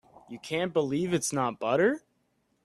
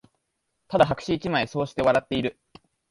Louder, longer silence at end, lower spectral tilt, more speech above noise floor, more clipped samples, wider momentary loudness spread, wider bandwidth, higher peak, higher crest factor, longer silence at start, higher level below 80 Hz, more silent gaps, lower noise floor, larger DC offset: second, -28 LUFS vs -24 LUFS; about the same, 0.65 s vs 0.6 s; second, -4.5 dB/octave vs -6 dB/octave; second, 45 dB vs 53 dB; neither; first, 13 LU vs 7 LU; first, 13.5 kHz vs 11.5 kHz; second, -12 dBFS vs -4 dBFS; about the same, 18 dB vs 22 dB; second, 0.3 s vs 0.7 s; second, -68 dBFS vs -52 dBFS; neither; second, -73 dBFS vs -77 dBFS; neither